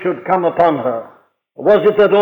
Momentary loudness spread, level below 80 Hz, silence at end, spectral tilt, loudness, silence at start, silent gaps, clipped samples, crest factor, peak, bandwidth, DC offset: 9 LU; -54 dBFS; 0 s; -8 dB/octave; -14 LUFS; 0 s; none; under 0.1%; 14 dB; -2 dBFS; 5.2 kHz; under 0.1%